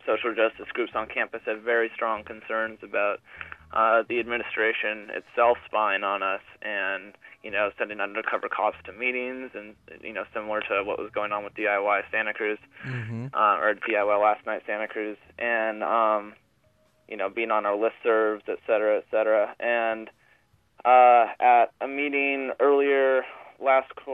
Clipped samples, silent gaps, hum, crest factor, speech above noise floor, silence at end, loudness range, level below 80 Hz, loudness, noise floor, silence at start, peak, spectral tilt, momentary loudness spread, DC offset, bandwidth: under 0.1%; none; none; 18 dB; 40 dB; 0 s; 7 LU; -66 dBFS; -25 LUFS; -65 dBFS; 0.05 s; -6 dBFS; -7 dB/octave; 12 LU; under 0.1%; 4.4 kHz